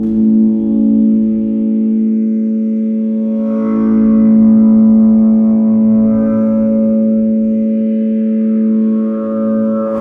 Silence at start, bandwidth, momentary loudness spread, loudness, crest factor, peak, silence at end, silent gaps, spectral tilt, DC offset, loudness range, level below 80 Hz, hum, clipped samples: 0 s; 2.3 kHz; 7 LU; -12 LUFS; 10 dB; -2 dBFS; 0 s; none; -12.5 dB/octave; under 0.1%; 4 LU; -44 dBFS; none; under 0.1%